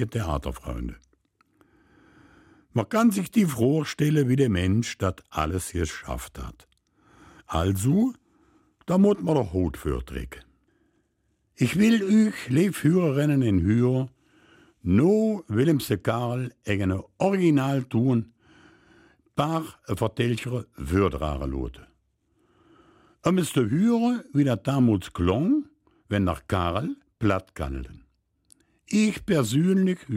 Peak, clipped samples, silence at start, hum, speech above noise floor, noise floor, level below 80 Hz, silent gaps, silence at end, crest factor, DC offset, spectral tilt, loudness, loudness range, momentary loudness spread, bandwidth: -6 dBFS; under 0.1%; 0 s; none; 48 dB; -71 dBFS; -44 dBFS; none; 0 s; 18 dB; under 0.1%; -7 dB/octave; -25 LUFS; 6 LU; 12 LU; 16.5 kHz